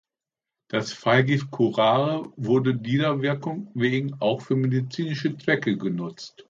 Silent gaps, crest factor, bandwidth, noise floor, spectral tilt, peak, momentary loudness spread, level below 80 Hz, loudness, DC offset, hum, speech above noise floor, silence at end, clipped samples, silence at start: none; 20 dB; 7.6 kHz; -89 dBFS; -7 dB/octave; -6 dBFS; 9 LU; -66 dBFS; -24 LUFS; under 0.1%; none; 65 dB; 0.2 s; under 0.1%; 0.75 s